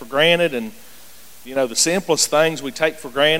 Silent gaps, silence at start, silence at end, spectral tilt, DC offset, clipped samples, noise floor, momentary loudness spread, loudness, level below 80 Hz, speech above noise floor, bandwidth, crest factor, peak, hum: none; 0 s; 0 s; -2 dB/octave; 0.9%; under 0.1%; -45 dBFS; 10 LU; -18 LUFS; -56 dBFS; 26 dB; 17 kHz; 18 dB; -2 dBFS; none